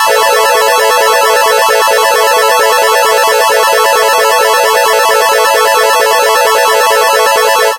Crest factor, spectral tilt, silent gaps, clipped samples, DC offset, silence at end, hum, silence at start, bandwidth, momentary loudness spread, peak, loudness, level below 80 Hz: 8 dB; 1.5 dB/octave; none; 0.4%; under 0.1%; 0 s; none; 0 s; 17 kHz; 0 LU; 0 dBFS; -7 LUFS; -54 dBFS